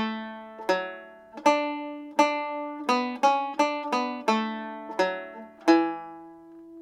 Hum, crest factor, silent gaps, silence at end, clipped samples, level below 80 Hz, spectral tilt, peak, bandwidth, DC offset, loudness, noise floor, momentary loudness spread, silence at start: none; 20 dB; none; 0 s; under 0.1%; -76 dBFS; -4 dB/octave; -6 dBFS; 14.5 kHz; under 0.1%; -27 LUFS; -47 dBFS; 18 LU; 0 s